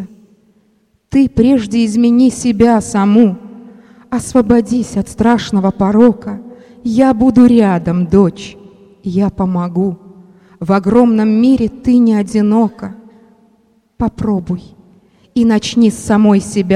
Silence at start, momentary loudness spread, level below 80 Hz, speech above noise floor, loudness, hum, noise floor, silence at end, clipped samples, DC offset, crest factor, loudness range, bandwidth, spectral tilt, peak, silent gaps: 0 s; 13 LU; -40 dBFS; 45 dB; -12 LUFS; none; -56 dBFS; 0 s; under 0.1%; under 0.1%; 12 dB; 4 LU; 11.5 kHz; -7 dB/octave; 0 dBFS; none